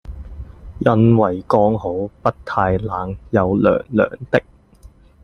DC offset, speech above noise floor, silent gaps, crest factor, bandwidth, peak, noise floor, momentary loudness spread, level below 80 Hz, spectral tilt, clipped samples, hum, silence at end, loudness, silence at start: under 0.1%; 29 dB; none; 18 dB; 6.6 kHz; 0 dBFS; -45 dBFS; 18 LU; -40 dBFS; -9.5 dB/octave; under 0.1%; none; 0.35 s; -18 LUFS; 0.05 s